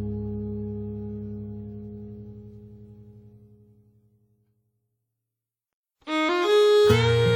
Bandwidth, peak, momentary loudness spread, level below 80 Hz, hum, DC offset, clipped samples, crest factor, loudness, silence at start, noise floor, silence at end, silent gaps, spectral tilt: 15.5 kHz; -8 dBFS; 25 LU; -48 dBFS; none; under 0.1%; under 0.1%; 20 dB; -23 LUFS; 0 s; -88 dBFS; 0 s; 5.73-5.84 s; -6 dB/octave